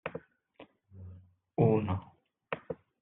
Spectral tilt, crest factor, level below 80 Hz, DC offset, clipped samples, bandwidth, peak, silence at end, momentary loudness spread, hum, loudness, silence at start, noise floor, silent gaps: -8 dB/octave; 22 dB; -66 dBFS; under 0.1%; under 0.1%; 4 kHz; -12 dBFS; 0.3 s; 24 LU; none; -33 LUFS; 0.05 s; -61 dBFS; none